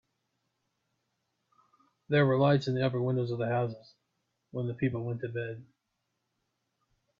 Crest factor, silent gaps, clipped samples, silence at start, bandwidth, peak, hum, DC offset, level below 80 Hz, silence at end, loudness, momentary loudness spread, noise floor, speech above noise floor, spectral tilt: 20 dB; none; under 0.1%; 2.1 s; 7.2 kHz; -12 dBFS; none; under 0.1%; -70 dBFS; 1.55 s; -30 LUFS; 14 LU; -82 dBFS; 53 dB; -8.5 dB/octave